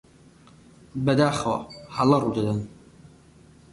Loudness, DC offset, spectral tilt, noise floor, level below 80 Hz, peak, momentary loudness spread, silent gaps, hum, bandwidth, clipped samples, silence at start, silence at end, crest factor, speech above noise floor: -24 LUFS; under 0.1%; -6.5 dB/octave; -53 dBFS; -54 dBFS; -8 dBFS; 14 LU; none; none; 11.5 kHz; under 0.1%; 0.95 s; 1.05 s; 18 dB; 30 dB